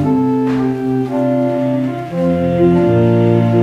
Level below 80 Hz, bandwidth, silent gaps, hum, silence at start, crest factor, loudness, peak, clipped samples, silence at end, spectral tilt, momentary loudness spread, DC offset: -44 dBFS; 7.8 kHz; none; none; 0 s; 12 dB; -14 LUFS; 0 dBFS; under 0.1%; 0 s; -9.5 dB/octave; 6 LU; under 0.1%